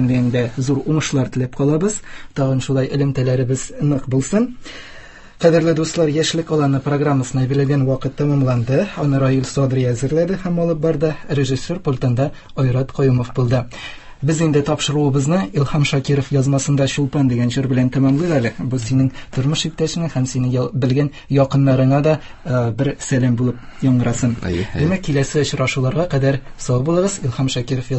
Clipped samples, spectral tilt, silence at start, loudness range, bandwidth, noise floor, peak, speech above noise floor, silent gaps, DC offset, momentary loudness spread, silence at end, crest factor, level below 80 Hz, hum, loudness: under 0.1%; -6.5 dB/octave; 0 s; 2 LU; 8.6 kHz; -38 dBFS; 0 dBFS; 21 dB; none; under 0.1%; 5 LU; 0 s; 16 dB; -40 dBFS; none; -18 LUFS